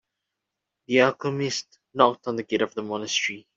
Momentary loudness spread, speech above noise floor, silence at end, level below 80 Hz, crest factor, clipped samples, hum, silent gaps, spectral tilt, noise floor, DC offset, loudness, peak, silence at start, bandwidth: 10 LU; 60 dB; 0.15 s; -70 dBFS; 24 dB; under 0.1%; none; none; -4 dB/octave; -84 dBFS; under 0.1%; -24 LUFS; -2 dBFS; 0.9 s; 7.8 kHz